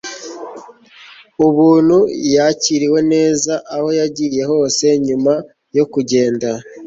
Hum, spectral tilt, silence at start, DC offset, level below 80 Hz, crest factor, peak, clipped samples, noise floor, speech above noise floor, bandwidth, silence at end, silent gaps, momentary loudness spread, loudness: none; -4.5 dB/octave; 0.05 s; under 0.1%; -56 dBFS; 14 dB; -2 dBFS; under 0.1%; -41 dBFS; 28 dB; 8 kHz; 0 s; none; 12 LU; -14 LUFS